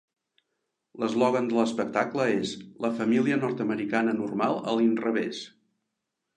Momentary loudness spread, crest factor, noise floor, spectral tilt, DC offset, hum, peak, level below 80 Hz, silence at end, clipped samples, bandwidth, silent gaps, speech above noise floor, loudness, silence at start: 8 LU; 18 dB; -83 dBFS; -6 dB/octave; under 0.1%; none; -8 dBFS; -74 dBFS; 0.9 s; under 0.1%; 9.8 kHz; none; 57 dB; -27 LUFS; 0.95 s